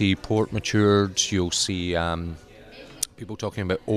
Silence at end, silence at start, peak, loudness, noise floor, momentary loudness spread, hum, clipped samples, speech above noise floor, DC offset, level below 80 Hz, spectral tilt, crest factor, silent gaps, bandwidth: 0 s; 0 s; -6 dBFS; -24 LUFS; -45 dBFS; 15 LU; none; under 0.1%; 21 dB; under 0.1%; -50 dBFS; -4 dB/octave; 18 dB; none; 14 kHz